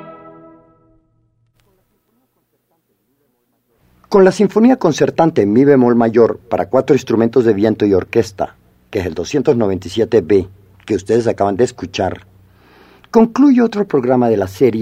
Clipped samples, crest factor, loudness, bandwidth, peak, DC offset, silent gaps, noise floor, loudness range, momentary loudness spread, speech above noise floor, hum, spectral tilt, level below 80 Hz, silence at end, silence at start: under 0.1%; 14 dB; -14 LUFS; 14.5 kHz; 0 dBFS; under 0.1%; none; -64 dBFS; 5 LU; 11 LU; 51 dB; none; -7 dB/octave; -50 dBFS; 0 s; 0.05 s